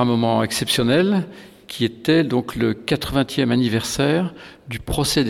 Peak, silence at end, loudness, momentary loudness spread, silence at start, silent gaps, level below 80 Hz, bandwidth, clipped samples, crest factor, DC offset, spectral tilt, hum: -4 dBFS; 0 s; -20 LUFS; 12 LU; 0 s; none; -42 dBFS; 17.5 kHz; under 0.1%; 16 dB; under 0.1%; -5 dB/octave; none